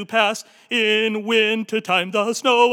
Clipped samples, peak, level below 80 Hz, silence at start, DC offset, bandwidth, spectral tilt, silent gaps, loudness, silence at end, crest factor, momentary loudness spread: under 0.1%; -4 dBFS; under -90 dBFS; 0 s; under 0.1%; 16.5 kHz; -3 dB/octave; none; -19 LUFS; 0 s; 16 dB; 5 LU